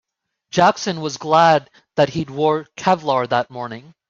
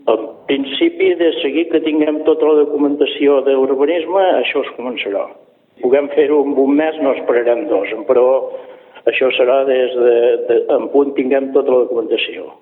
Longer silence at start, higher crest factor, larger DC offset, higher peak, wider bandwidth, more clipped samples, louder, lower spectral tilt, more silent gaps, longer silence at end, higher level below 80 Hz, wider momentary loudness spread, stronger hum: first, 0.55 s vs 0.05 s; about the same, 16 dB vs 14 dB; neither; about the same, -2 dBFS vs 0 dBFS; first, 7.8 kHz vs 4.1 kHz; neither; second, -18 LUFS vs -15 LUFS; second, -5 dB/octave vs -8 dB/octave; neither; first, 0.3 s vs 0.1 s; first, -60 dBFS vs -70 dBFS; first, 12 LU vs 8 LU; neither